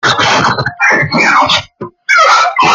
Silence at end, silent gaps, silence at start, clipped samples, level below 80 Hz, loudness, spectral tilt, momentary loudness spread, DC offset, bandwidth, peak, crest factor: 0 s; none; 0.05 s; under 0.1%; -48 dBFS; -8 LUFS; -3 dB/octave; 7 LU; under 0.1%; 15 kHz; 0 dBFS; 10 dB